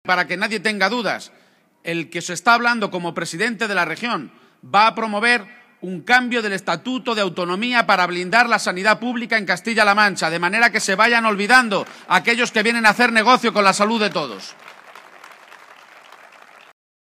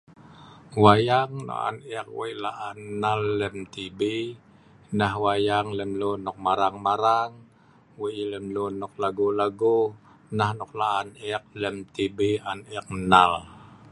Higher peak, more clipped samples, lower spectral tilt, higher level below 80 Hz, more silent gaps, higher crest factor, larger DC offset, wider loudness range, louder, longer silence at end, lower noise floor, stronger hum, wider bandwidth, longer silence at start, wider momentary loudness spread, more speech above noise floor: about the same, 0 dBFS vs -2 dBFS; neither; second, -3 dB/octave vs -6 dB/octave; second, -66 dBFS vs -56 dBFS; neither; about the same, 20 dB vs 24 dB; neither; about the same, 6 LU vs 4 LU; first, -17 LUFS vs -25 LUFS; first, 2.2 s vs 0.05 s; second, -46 dBFS vs -56 dBFS; neither; first, 15.5 kHz vs 11.5 kHz; second, 0.05 s vs 0.3 s; second, 11 LU vs 14 LU; second, 27 dB vs 31 dB